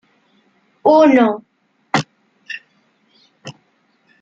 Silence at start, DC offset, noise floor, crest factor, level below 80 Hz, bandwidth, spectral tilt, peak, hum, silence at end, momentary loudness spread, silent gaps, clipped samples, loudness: 0.85 s; under 0.1%; -61 dBFS; 18 dB; -64 dBFS; 9 kHz; -6 dB/octave; -2 dBFS; none; 0.7 s; 27 LU; none; under 0.1%; -14 LUFS